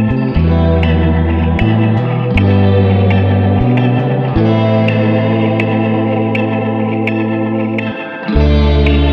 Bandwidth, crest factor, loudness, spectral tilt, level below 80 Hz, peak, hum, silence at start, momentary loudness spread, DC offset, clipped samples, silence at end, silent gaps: 5.6 kHz; 12 dB; -13 LUFS; -9.5 dB/octave; -20 dBFS; 0 dBFS; none; 0 s; 5 LU; under 0.1%; under 0.1%; 0 s; none